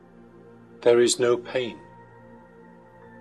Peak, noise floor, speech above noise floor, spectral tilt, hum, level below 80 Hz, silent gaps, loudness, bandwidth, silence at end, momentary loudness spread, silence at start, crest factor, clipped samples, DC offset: -6 dBFS; -50 dBFS; 28 dB; -3.5 dB/octave; none; -62 dBFS; none; -22 LUFS; 12.5 kHz; 1.45 s; 14 LU; 0.8 s; 20 dB; under 0.1%; under 0.1%